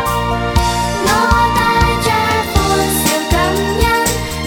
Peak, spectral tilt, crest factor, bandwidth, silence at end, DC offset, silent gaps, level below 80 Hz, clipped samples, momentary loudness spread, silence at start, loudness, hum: 0 dBFS; -4 dB/octave; 14 dB; 19 kHz; 0 s; under 0.1%; none; -24 dBFS; under 0.1%; 4 LU; 0 s; -14 LUFS; none